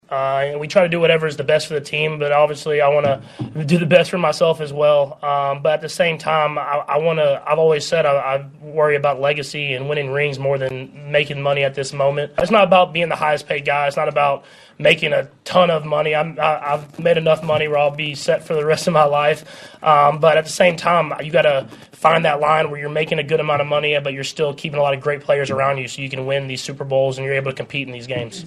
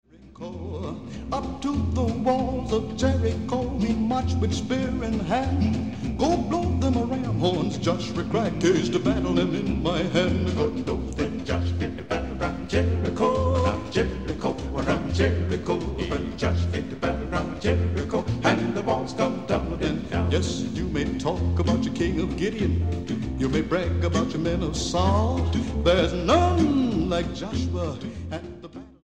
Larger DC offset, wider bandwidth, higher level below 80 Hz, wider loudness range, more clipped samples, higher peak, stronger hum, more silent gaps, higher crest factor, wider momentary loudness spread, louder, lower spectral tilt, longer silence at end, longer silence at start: second, under 0.1% vs 0.5%; first, 13 kHz vs 9.2 kHz; second, -58 dBFS vs -36 dBFS; about the same, 4 LU vs 3 LU; neither; first, 0 dBFS vs -6 dBFS; neither; neither; about the same, 18 dB vs 20 dB; about the same, 8 LU vs 7 LU; first, -18 LUFS vs -25 LUFS; second, -5 dB/octave vs -6.5 dB/octave; about the same, 0 s vs 0 s; about the same, 0.1 s vs 0.05 s